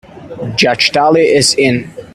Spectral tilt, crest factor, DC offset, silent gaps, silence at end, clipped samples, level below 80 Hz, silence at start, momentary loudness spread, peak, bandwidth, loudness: -3.5 dB/octave; 12 dB; under 0.1%; none; 0.1 s; under 0.1%; -46 dBFS; 0.15 s; 10 LU; 0 dBFS; 14.5 kHz; -11 LUFS